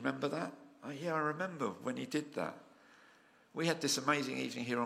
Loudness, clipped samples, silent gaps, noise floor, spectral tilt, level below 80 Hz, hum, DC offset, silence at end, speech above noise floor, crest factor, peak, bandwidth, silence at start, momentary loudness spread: -37 LUFS; under 0.1%; none; -65 dBFS; -4 dB/octave; -84 dBFS; none; under 0.1%; 0 s; 28 dB; 22 dB; -16 dBFS; 16 kHz; 0 s; 13 LU